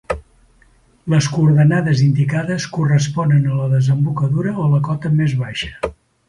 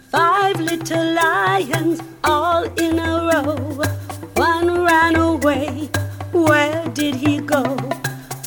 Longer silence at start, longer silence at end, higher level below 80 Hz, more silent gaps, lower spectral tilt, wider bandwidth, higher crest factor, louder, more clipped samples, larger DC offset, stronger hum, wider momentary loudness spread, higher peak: about the same, 0.1 s vs 0.15 s; first, 0.35 s vs 0 s; about the same, -44 dBFS vs -44 dBFS; neither; first, -7 dB/octave vs -5 dB/octave; second, 10.5 kHz vs 19.5 kHz; about the same, 14 dB vs 16 dB; about the same, -17 LUFS vs -18 LUFS; neither; neither; neither; about the same, 11 LU vs 9 LU; about the same, -4 dBFS vs -2 dBFS